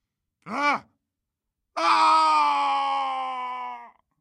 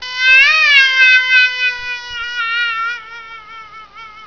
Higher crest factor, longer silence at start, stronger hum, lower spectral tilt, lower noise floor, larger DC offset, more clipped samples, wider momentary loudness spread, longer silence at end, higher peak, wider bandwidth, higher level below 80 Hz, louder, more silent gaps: about the same, 16 dB vs 14 dB; first, 0.45 s vs 0 s; neither; first, -2 dB/octave vs 2 dB/octave; first, -84 dBFS vs -35 dBFS; second, under 0.1% vs 0.4%; neither; about the same, 17 LU vs 15 LU; first, 0.3 s vs 0 s; second, -8 dBFS vs 0 dBFS; first, 11 kHz vs 5.4 kHz; second, -82 dBFS vs -52 dBFS; second, -23 LUFS vs -9 LUFS; neither